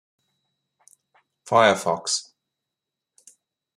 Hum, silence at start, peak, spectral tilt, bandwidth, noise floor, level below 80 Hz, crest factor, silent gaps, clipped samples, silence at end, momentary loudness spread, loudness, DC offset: none; 1.45 s; -2 dBFS; -2.5 dB/octave; 14.5 kHz; -85 dBFS; -74 dBFS; 24 dB; none; under 0.1%; 1.55 s; 9 LU; -21 LUFS; under 0.1%